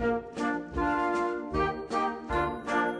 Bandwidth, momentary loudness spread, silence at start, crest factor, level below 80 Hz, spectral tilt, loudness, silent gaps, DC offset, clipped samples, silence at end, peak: 11 kHz; 3 LU; 0 s; 14 dB; -46 dBFS; -6 dB/octave; -30 LUFS; none; under 0.1%; under 0.1%; 0 s; -16 dBFS